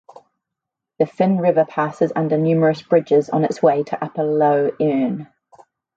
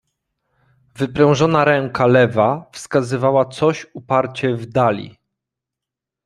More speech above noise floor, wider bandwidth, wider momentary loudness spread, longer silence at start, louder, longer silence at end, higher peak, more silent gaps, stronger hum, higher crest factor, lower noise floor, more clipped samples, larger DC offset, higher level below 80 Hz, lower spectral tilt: about the same, 66 dB vs 69 dB; second, 8 kHz vs 12 kHz; second, 7 LU vs 11 LU; about the same, 1 s vs 1 s; about the same, -18 LUFS vs -17 LUFS; second, 0.7 s vs 1.15 s; about the same, -2 dBFS vs -2 dBFS; neither; neither; about the same, 16 dB vs 18 dB; about the same, -83 dBFS vs -85 dBFS; neither; neither; second, -66 dBFS vs -54 dBFS; first, -8.5 dB/octave vs -6.5 dB/octave